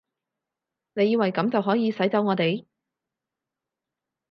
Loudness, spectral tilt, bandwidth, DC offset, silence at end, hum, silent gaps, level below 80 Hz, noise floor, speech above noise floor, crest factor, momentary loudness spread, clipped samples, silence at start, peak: -24 LUFS; -8.5 dB/octave; 6 kHz; under 0.1%; 1.7 s; none; none; -78 dBFS; -87 dBFS; 64 dB; 18 dB; 5 LU; under 0.1%; 0.95 s; -8 dBFS